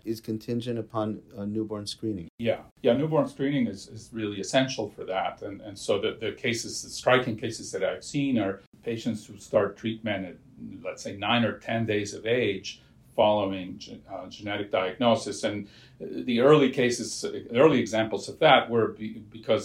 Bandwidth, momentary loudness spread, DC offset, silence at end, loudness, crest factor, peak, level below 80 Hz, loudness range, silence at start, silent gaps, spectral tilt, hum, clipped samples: 14.5 kHz; 18 LU; under 0.1%; 0 s; -27 LUFS; 22 dB; -4 dBFS; -62 dBFS; 6 LU; 0.05 s; 2.29-2.38 s, 2.71-2.76 s, 8.67-8.72 s; -5 dB/octave; none; under 0.1%